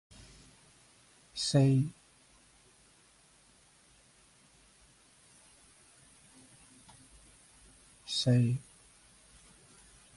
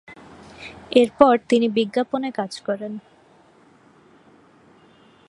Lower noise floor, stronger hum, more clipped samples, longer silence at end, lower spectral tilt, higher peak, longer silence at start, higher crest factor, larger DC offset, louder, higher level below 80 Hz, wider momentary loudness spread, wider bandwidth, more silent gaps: first, -64 dBFS vs -54 dBFS; neither; neither; second, 1.55 s vs 2.3 s; about the same, -6 dB/octave vs -5.5 dB/octave; second, -16 dBFS vs 0 dBFS; first, 1.35 s vs 0.1 s; about the same, 22 dB vs 22 dB; neither; second, -30 LUFS vs -20 LUFS; second, -66 dBFS vs -60 dBFS; first, 30 LU vs 23 LU; about the same, 11.5 kHz vs 11.5 kHz; neither